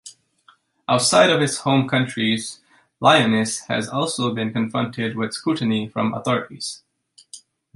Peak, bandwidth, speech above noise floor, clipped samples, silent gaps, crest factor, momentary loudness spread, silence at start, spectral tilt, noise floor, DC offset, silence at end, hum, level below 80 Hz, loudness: -2 dBFS; 11.5 kHz; 37 dB; under 0.1%; none; 20 dB; 11 LU; 0.05 s; -4 dB/octave; -57 dBFS; under 0.1%; 0.35 s; none; -62 dBFS; -20 LUFS